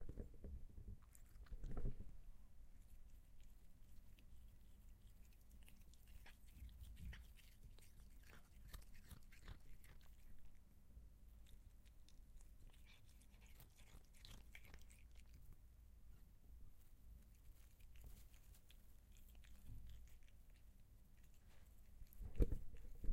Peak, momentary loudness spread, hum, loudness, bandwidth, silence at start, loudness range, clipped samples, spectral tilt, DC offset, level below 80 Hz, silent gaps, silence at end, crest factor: -26 dBFS; 12 LU; none; -61 LUFS; 16 kHz; 0 s; 8 LU; under 0.1%; -6 dB/octave; under 0.1%; -56 dBFS; none; 0 s; 28 dB